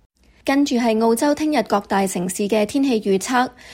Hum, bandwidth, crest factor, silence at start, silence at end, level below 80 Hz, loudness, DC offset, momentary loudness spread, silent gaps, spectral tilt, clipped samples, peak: none; 16.5 kHz; 14 dB; 0.45 s; 0 s; -56 dBFS; -19 LUFS; under 0.1%; 4 LU; none; -4.5 dB/octave; under 0.1%; -6 dBFS